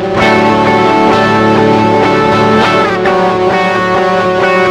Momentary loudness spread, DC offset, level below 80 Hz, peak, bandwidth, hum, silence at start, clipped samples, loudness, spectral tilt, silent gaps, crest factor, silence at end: 2 LU; under 0.1%; -38 dBFS; 0 dBFS; 12.5 kHz; none; 0 s; 0.7%; -9 LUFS; -6 dB/octave; none; 8 dB; 0 s